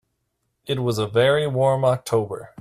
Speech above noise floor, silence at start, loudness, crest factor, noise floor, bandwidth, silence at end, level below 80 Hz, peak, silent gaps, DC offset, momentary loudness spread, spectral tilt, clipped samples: 54 dB; 0.65 s; -21 LUFS; 16 dB; -74 dBFS; 15 kHz; 0.15 s; -58 dBFS; -6 dBFS; none; under 0.1%; 10 LU; -6 dB/octave; under 0.1%